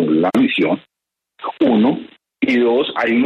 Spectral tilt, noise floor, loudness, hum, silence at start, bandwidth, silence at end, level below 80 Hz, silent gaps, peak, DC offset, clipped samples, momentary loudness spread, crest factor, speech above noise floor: -7 dB/octave; -59 dBFS; -16 LUFS; none; 0 s; 8.8 kHz; 0 s; -62 dBFS; none; -4 dBFS; under 0.1%; under 0.1%; 12 LU; 14 dB; 43 dB